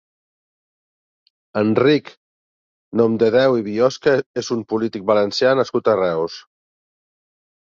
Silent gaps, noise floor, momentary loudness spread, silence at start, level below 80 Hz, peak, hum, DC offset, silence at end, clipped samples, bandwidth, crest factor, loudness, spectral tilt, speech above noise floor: 2.17-2.91 s, 4.26-4.34 s; under -90 dBFS; 9 LU; 1.55 s; -60 dBFS; -2 dBFS; none; under 0.1%; 1.35 s; under 0.1%; 7.4 kHz; 18 dB; -18 LUFS; -6 dB/octave; over 73 dB